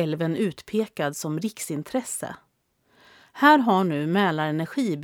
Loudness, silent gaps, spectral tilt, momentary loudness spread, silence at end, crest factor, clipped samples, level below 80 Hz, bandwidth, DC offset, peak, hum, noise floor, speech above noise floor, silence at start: -24 LUFS; none; -5 dB/octave; 12 LU; 0 s; 20 dB; under 0.1%; -70 dBFS; 18.5 kHz; under 0.1%; -4 dBFS; none; -67 dBFS; 43 dB; 0 s